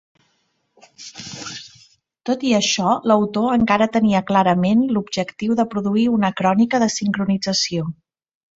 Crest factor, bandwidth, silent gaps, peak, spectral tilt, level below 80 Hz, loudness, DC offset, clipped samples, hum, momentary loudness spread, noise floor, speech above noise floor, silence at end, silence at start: 18 dB; 8 kHz; none; -2 dBFS; -5 dB/octave; -56 dBFS; -18 LUFS; under 0.1%; under 0.1%; none; 15 LU; -67 dBFS; 49 dB; 0.65 s; 1 s